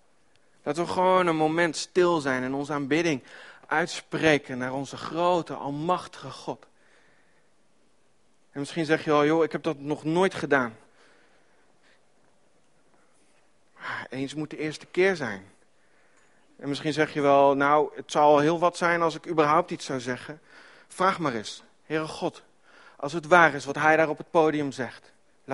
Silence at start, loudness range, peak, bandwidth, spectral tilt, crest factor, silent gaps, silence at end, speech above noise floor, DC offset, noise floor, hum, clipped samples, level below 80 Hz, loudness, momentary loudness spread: 0.65 s; 11 LU; -2 dBFS; 11.5 kHz; -5 dB/octave; 24 dB; none; 0 s; 43 dB; under 0.1%; -68 dBFS; none; under 0.1%; -66 dBFS; -25 LUFS; 16 LU